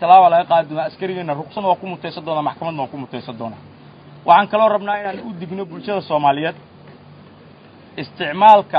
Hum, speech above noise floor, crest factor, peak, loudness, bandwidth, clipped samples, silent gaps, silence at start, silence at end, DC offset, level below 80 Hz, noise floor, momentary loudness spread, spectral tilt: none; 27 dB; 18 dB; 0 dBFS; -17 LUFS; 5.2 kHz; under 0.1%; none; 0 s; 0 s; under 0.1%; -62 dBFS; -44 dBFS; 19 LU; -7.5 dB/octave